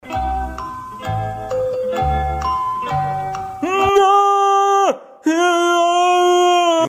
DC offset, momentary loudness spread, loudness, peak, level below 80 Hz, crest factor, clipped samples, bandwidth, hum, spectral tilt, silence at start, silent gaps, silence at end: under 0.1%; 11 LU; -16 LUFS; -4 dBFS; -34 dBFS; 12 dB; under 0.1%; 15.5 kHz; none; -4.5 dB/octave; 0.05 s; none; 0 s